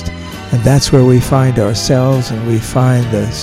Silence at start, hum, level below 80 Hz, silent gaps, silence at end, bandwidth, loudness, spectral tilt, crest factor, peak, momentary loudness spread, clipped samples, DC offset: 0 s; none; -30 dBFS; none; 0 s; 14 kHz; -12 LUFS; -6 dB/octave; 12 dB; 0 dBFS; 7 LU; under 0.1%; under 0.1%